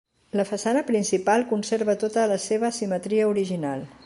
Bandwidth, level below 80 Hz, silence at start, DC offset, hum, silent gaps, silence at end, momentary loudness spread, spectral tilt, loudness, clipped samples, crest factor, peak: 11.5 kHz; -68 dBFS; 0.35 s; under 0.1%; none; none; 0.15 s; 6 LU; -5 dB/octave; -24 LUFS; under 0.1%; 16 dB; -8 dBFS